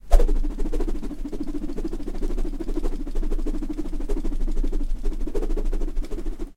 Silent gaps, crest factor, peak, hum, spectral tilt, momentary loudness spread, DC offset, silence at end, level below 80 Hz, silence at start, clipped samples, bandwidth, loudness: none; 22 dB; 0 dBFS; none; -7.5 dB/octave; 3 LU; under 0.1%; 0.05 s; -24 dBFS; 0.05 s; under 0.1%; 8.4 kHz; -31 LUFS